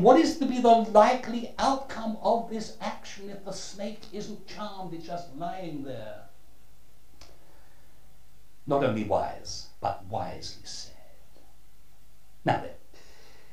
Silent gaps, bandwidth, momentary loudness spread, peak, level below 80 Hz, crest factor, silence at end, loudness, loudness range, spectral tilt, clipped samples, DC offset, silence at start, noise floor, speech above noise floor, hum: none; 15.5 kHz; 20 LU; -4 dBFS; -56 dBFS; 26 dB; 0.75 s; -28 LUFS; 15 LU; -5.5 dB/octave; under 0.1%; 1%; 0 s; -60 dBFS; 32 dB; none